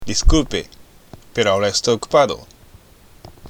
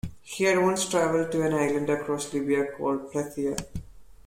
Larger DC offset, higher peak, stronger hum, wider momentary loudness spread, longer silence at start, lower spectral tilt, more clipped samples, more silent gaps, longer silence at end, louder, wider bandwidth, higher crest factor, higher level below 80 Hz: neither; first, -2 dBFS vs -10 dBFS; neither; about the same, 11 LU vs 10 LU; about the same, 0 s vs 0.05 s; about the same, -4 dB/octave vs -4.5 dB/octave; neither; neither; second, 0 s vs 0.15 s; first, -18 LUFS vs -26 LUFS; second, 14.5 kHz vs 16.5 kHz; about the same, 18 dB vs 16 dB; first, -24 dBFS vs -52 dBFS